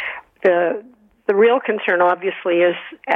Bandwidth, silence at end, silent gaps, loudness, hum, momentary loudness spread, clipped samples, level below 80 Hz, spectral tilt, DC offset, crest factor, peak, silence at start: 4.6 kHz; 0 s; none; -18 LUFS; none; 13 LU; under 0.1%; -68 dBFS; -7 dB/octave; under 0.1%; 14 dB; -4 dBFS; 0 s